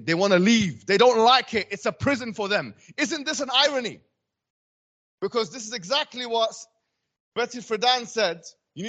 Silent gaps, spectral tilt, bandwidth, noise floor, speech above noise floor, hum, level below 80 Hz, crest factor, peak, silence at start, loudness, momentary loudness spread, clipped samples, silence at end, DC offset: 4.50-5.18 s, 7.20-7.32 s; -3.5 dB/octave; 9 kHz; under -90 dBFS; over 67 dB; none; -64 dBFS; 20 dB; -4 dBFS; 0 s; -23 LUFS; 15 LU; under 0.1%; 0 s; under 0.1%